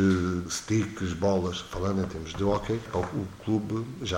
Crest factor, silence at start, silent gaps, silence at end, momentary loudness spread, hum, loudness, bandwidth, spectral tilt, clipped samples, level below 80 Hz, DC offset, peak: 16 dB; 0 s; none; 0 s; 6 LU; none; -29 LUFS; 16.5 kHz; -6 dB/octave; under 0.1%; -48 dBFS; under 0.1%; -12 dBFS